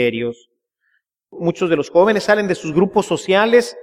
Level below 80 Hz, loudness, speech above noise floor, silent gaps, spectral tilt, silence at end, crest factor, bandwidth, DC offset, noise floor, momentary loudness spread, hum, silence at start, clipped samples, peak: -58 dBFS; -17 LUFS; 51 dB; none; -5.5 dB/octave; 0 s; 16 dB; 14 kHz; under 0.1%; -67 dBFS; 10 LU; none; 0 s; under 0.1%; -2 dBFS